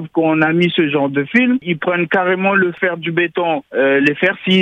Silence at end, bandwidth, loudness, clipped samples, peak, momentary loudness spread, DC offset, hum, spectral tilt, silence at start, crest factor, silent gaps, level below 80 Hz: 0 s; 8 kHz; -15 LUFS; under 0.1%; 0 dBFS; 4 LU; under 0.1%; none; -7.5 dB/octave; 0 s; 14 dB; none; -62 dBFS